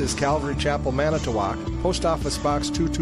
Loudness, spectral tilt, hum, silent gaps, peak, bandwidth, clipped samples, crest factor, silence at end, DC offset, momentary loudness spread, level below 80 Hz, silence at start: -24 LUFS; -5 dB/octave; none; none; -10 dBFS; 14.5 kHz; under 0.1%; 14 dB; 0 s; under 0.1%; 2 LU; -32 dBFS; 0 s